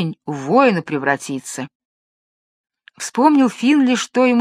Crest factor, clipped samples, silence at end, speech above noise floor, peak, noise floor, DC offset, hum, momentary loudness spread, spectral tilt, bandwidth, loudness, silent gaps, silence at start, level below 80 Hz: 18 dB; under 0.1%; 0 s; over 74 dB; 0 dBFS; under -90 dBFS; under 0.1%; none; 15 LU; -5 dB/octave; 13.5 kHz; -17 LUFS; 1.75-2.64 s; 0 s; -70 dBFS